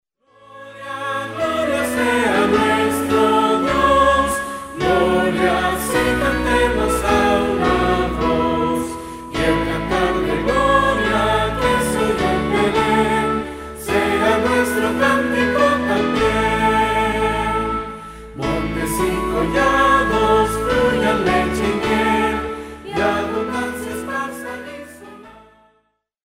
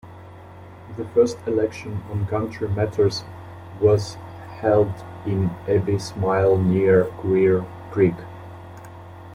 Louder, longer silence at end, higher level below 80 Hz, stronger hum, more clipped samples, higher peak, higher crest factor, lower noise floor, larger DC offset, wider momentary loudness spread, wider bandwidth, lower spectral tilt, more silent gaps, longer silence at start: first, -18 LUFS vs -21 LUFS; first, 0.9 s vs 0 s; first, -34 dBFS vs -52 dBFS; neither; neither; about the same, -2 dBFS vs -4 dBFS; about the same, 16 dB vs 18 dB; first, -66 dBFS vs -41 dBFS; neither; second, 11 LU vs 22 LU; first, 16 kHz vs 11.5 kHz; second, -5 dB/octave vs -7.5 dB/octave; neither; first, 0.5 s vs 0.05 s